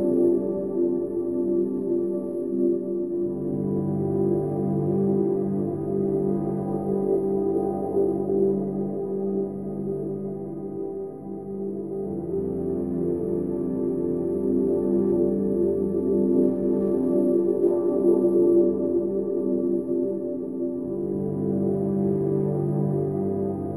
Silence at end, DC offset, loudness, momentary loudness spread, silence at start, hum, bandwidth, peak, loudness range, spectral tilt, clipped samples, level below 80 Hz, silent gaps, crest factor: 0 s; 0.2%; -25 LUFS; 8 LU; 0 s; none; 11.5 kHz; -10 dBFS; 7 LU; -12.5 dB/octave; under 0.1%; -56 dBFS; none; 16 dB